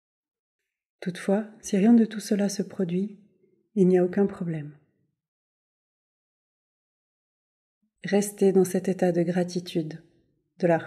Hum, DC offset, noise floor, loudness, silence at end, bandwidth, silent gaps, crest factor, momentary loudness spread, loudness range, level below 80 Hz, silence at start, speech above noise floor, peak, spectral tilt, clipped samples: none; under 0.1%; -67 dBFS; -25 LUFS; 0 s; 14 kHz; 5.28-7.81 s; 18 dB; 15 LU; 10 LU; -74 dBFS; 1 s; 43 dB; -10 dBFS; -6.5 dB/octave; under 0.1%